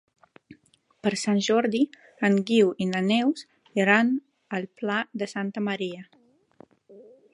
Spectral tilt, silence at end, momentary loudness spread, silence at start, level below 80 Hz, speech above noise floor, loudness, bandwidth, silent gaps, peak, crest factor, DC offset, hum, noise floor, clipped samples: -5 dB/octave; 0.3 s; 12 LU; 0.5 s; -74 dBFS; 39 dB; -25 LUFS; 11 kHz; none; -4 dBFS; 22 dB; under 0.1%; none; -63 dBFS; under 0.1%